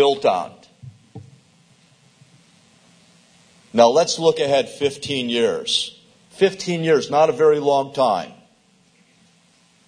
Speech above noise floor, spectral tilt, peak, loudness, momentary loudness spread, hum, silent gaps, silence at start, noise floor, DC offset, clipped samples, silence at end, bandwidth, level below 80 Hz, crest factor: 39 dB; -4 dB/octave; 0 dBFS; -19 LUFS; 10 LU; none; none; 0 s; -57 dBFS; under 0.1%; under 0.1%; 1.55 s; 10.5 kHz; -66 dBFS; 22 dB